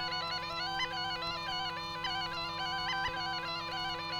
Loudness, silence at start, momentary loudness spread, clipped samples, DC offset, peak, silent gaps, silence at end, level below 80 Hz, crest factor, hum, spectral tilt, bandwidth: -35 LUFS; 0 s; 2 LU; under 0.1%; under 0.1%; -24 dBFS; none; 0 s; -58 dBFS; 12 dB; 50 Hz at -55 dBFS; -2.5 dB/octave; 19.5 kHz